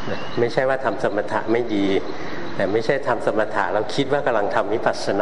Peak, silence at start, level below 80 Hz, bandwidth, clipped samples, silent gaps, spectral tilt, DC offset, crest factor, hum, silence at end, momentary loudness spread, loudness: -2 dBFS; 0 s; -54 dBFS; 11.5 kHz; under 0.1%; none; -5.5 dB/octave; 4%; 18 dB; none; 0 s; 4 LU; -22 LUFS